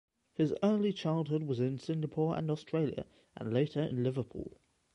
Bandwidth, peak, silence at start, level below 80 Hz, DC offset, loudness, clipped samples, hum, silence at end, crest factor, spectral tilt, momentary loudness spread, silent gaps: 10 kHz; -18 dBFS; 0.4 s; -66 dBFS; under 0.1%; -34 LUFS; under 0.1%; none; 0.45 s; 16 dB; -8.5 dB/octave; 14 LU; none